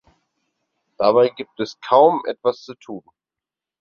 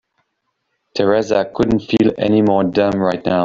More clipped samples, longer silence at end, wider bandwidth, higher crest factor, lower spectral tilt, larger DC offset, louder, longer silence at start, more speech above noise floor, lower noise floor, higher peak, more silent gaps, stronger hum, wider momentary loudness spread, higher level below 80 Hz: neither; first, 0.8 s vs 0 s; second, 6.8 kHz vs 7.6 kHz; about the same, 20 dB vs 16 dB; about the same, -6 dB/octave vs -7 dB/octave; neither; about the same, -18 LUFS vs -16 LUFS; about the same, 1 s vs 0.95 s; first, 70 dB vs 56 dB; first, -88 dBFS vs -71 dBFS; about the same, -2 dBFS vs 0 dBFS; neither; neither; first, 21 LU vs 4 LU; second, -66 dBFS vs -46 dBFS